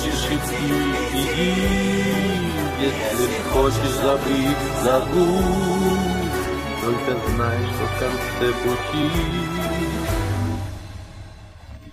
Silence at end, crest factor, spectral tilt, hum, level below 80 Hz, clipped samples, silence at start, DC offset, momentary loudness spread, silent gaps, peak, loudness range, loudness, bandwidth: 0 s; 16 dB; -5 dB/octave; none; -32 dBFS; under 0.1%; 0 s; under 0.1%; 6 LU; none; -6 dBFS; 4 LU; -21 LUFS; 15.5 kHz